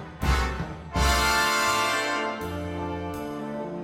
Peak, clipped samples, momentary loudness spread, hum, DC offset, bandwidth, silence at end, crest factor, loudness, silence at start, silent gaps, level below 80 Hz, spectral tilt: -10 dBFS; under 0.1%; 12 LU; none; under 0.1%; 16.5 kHz; 0 s; 18 dB; -26 LUFS; 0 s; none; -34 dBFS; -3.5 dB/octave